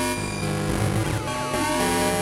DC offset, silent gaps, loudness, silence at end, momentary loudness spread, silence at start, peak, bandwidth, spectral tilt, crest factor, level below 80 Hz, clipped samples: under 0.1%; none; -24 LUFS; 0 s; 5 LU; 0 s; -8 dBFS; 16.5 kHz; -4.5 dB/octave; 16 dB; -40 dBFS; under 0.1%